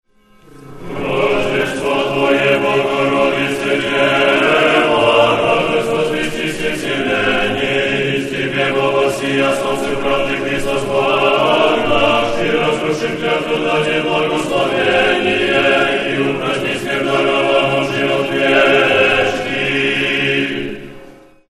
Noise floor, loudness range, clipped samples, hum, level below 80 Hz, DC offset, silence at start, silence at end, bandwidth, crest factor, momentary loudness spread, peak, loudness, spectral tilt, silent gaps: -46 dBFS; 3 LU; under 0.1%; none; -42 dBFS; under 0.1%; 0.55 s; 0.4 s; 13 kHz; 16 dB; 7 LU; 0 dBFS; -14 LUFS; -4.5 dB/octave; none